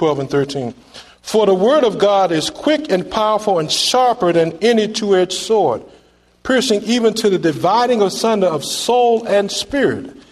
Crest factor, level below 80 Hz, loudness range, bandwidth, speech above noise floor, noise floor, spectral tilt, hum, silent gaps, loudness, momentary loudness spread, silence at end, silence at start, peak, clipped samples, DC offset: 14 dB; -52 dBFS; 1 LU; 13.5 kHz; 28 dB; -44 dBFS; -4 dB/octave; none; none; -15 LUFS; 6 LU; 0.1 s; 0 s; -2 dBFS; under 0.1%; under 0.1%